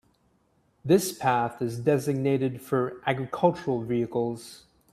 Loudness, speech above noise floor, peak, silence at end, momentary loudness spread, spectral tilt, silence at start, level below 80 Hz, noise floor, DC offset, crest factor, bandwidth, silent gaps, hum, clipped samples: -27 LUFS; 41 dB; -6 dBFS; 0.35 s; 7 LU; -6 dB/octave; 0.85 s; -64 dBFS; -67 dBFS; under 0.1%; 20 dB; 15.5 kHz; none; none; under 0.1%